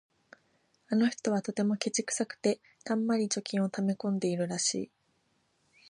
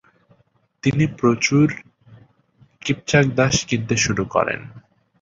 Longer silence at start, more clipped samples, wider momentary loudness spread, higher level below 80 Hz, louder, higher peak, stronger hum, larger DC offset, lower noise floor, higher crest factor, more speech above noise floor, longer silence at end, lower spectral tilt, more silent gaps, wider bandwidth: about the same, 0.9 s vs 0.85 s; neither; second, 4 LU vs 9 LU; second, -78 dBFS vs -48 dBFS; second, -31 LUFS vs -19 LUFS; second, -12 dBFS vs -2 dBFS; neither; neither; first, -73 dBFS vs -62 dBFS; about the same, 20 dB vs 20 dB; about the same, 43 dB vs 43 dB; first, 1.05 s vs 0.4 s; about the same, -4.5 dB/octave vs -5 dB/octave; neither; first, 11.5 kHz vs 7.8 kHz